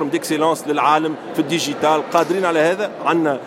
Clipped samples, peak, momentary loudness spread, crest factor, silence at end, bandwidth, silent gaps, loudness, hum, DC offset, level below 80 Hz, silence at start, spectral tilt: under 0.1%; -2 dBFS; 5 LU; 16 dB; 0 s; 16.5 kHz; none; -18 LUFS; none; under 0.1%; -70 dBFS; 0 s; -4.5 dB/octave